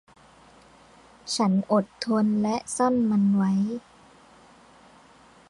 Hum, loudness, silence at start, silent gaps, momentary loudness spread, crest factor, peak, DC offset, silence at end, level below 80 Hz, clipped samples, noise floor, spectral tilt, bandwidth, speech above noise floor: none; -24 LUFS; 1.25 s; none; 9 LU; 16 dB; -10 dBFS; under 0.1%; 1.7 s; -64 dBFS; under 0.1%; -54 dBFS; -6 dB/octave; 11.5 kHz; 31 dB